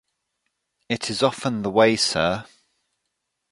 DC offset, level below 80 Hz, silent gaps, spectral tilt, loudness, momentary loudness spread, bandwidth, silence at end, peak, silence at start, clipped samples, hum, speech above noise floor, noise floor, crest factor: under 0.1%; -56 dBFS; none; -4 dB/octave; -22 LUFS; 10 LU; 11.5 kHz; 1.1 s; -4 dBFS; 0.9 s; under 0.1%; none; 57 dB; -78 dBFS; 22 dB